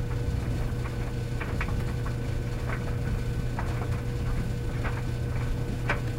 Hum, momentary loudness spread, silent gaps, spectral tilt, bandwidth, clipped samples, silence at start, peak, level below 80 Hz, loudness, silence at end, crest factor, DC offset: none; 2 LU; none; -7 dB/octave; 15.5 kHz; under 0.1%; 0 s; -14 dBFS; -34 dBFS; -31 LUFS; 0 s; 16 dB; under 0.1%